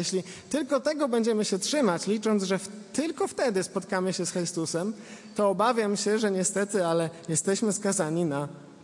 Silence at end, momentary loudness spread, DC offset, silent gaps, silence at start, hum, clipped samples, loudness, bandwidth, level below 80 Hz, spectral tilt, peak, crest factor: 0 s; 7 LU; under 0.1%; none; 0 s; none; under 0.1%; -27 LUFS; 11.5 kHz; -74 dBFS; -4 dB/octave; -12 dBFS; 16 dB